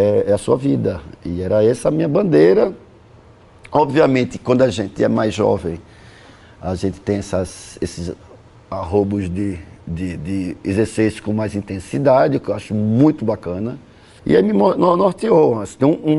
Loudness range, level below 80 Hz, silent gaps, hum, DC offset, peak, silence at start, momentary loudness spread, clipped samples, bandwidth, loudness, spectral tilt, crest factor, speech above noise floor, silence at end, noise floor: 7 LU; -44 dBFS; none; none; under 0.1%; -2 dBFS; 0 s; 14 LU; under 0.1%; 11.5 kHz; -18 LUFS; -7 dB/octave; 16 dB; 29 dB; 0 s; -45 dBFS